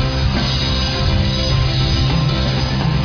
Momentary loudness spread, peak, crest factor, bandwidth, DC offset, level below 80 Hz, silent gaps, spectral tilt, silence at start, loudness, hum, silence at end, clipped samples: 2 LU; -4 dBFS; 12 dB; 5.4 kHz; under 0.1%; -22 dBFS; none; -5.5 dB/octave; 0 s; -17 LUFS; none; 0 s; under 0.1%